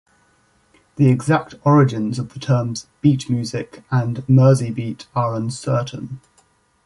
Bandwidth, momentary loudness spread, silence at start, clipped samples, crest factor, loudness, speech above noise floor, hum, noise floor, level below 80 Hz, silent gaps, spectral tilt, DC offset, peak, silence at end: 11.5 kHz; 13 LU; 1 s; under 0.1%; 16 dB; -19 LUFS; 41 dB; none; -59 dBFS; -54 dBFS; none; -7.5 dB/octave; under 0.1%; -2 dBFS; 0.7 s